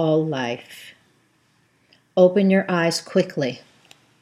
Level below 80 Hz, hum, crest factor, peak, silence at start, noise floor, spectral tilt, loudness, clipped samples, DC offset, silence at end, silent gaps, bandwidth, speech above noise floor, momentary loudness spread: -76 dBFS; none; 20 dB; -4 dBFS; 0 s; -62 dBFS; -6 dB/octave; -20 LUFS; under 0.1%; under 0.1%; 0.65 s; none; 14 kHz; 42 dB; 20 LU